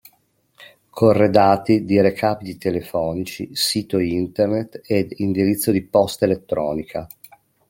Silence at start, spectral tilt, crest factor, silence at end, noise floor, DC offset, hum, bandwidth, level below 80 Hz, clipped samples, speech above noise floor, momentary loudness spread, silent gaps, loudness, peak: 0.6 s; -5.5 dB/octave; 20 dB; 0.65 s; -62 dBFS; under 0.1%; none; 17 kHz; -54 dBFS; under 0.1%; 43 dB; 11 LU; none; -19 LUFS; 0 dBFS